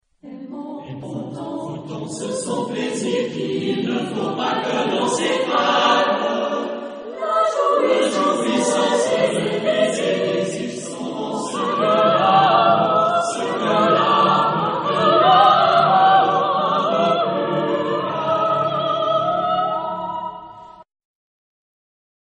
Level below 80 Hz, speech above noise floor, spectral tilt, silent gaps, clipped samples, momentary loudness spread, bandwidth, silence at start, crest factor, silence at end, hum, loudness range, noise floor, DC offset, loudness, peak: -62 dBFS; 20 dB; -4.5 dB/octave; none; under 0.1%; 15 LU; 10 kHz; 0.25 s; 16 dB; 1.55 s; none; 9 LU; -40 dBFS; under 0.1%; -18 LUFS; -2 dBFS